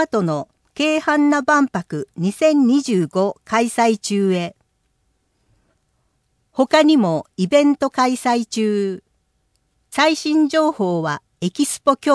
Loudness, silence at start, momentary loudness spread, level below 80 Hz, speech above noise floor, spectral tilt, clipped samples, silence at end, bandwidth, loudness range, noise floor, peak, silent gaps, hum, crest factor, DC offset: -18 LUFS; 0 s; 11 LU; -64 dBFS; 49 dB; -5 dB/octave; under 0.1%; 0 s; 11 kHz; 4 LU; -67 dBFS; -2 dBFS; none; none; 16 dB; under 0.1%